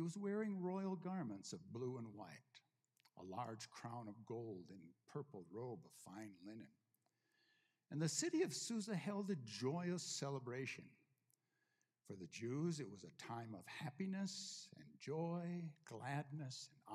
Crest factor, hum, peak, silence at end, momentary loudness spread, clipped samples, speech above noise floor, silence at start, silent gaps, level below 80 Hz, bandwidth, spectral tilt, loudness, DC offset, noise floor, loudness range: 22 dB; none; -26 dBFS; 0 s; 14 LU; under 0.1%; 39 dB; 0 s; none; under -90 dBFS; 14.5 kHz; -5 dB/octave; -48 LUFS; under 0.1%; -87 dBFS; 10 LU